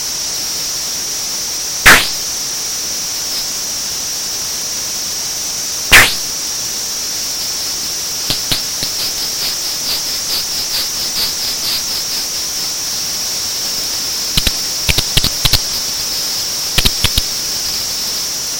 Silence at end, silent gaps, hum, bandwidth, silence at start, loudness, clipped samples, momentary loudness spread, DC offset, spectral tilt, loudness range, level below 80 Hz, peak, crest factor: 0 s; none; none; 17 kHz; 0 s; -14 LUFS; 0.2%; 5 LU; under 0.1%; 0 dB/octave; 3 LU; -30 dBFS; 0 dBFS; 16 dB